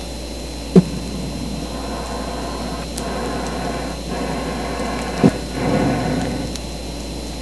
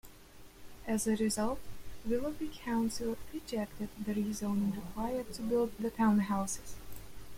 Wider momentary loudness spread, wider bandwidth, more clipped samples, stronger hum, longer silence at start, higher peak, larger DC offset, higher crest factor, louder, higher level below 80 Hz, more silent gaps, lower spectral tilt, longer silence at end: about the same, 12 LU vs 14 LU; second, 11 kHz vs 16.5 kHz; neither; neither; about the same, 0 s vs 0.05 s; first, 0 dBFS vs -18 dBFS; first, 0.9% vs under 0.1%; first, 22 dB vs 16 dB; first, -22 LUFS vs -35 LUFS; first, -32 dBFS vs -54 dBFS; neither; about the same, -5.5 dB/octave vs -5 dB/octave; about the same, 0 s vs 0 s